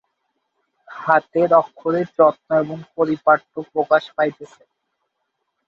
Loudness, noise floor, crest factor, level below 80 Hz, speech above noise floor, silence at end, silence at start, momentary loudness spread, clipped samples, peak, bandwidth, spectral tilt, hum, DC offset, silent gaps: -19 LUFS; -75 dBFS; 18 dB; -68 dBFS; 56 dB; 1.2 s; 0.9 s; 10 LU; under 0.1%; -2 dBFS; 7 kHz; -7.5 dB/octave; none; under 0.1%; none